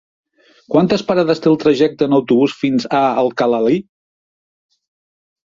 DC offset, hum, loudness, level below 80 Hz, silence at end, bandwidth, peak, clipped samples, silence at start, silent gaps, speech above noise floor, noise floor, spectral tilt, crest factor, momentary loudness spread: under 0.1%; none; -15 LUFS; -56 dBFS; 1.8 s; 7.6 kHz; 0 dBFS; under 0.1%; 0.7 s; none; over 76 dB; under -90 dBFS; -7 dB/octave; 16 dB; 4 LU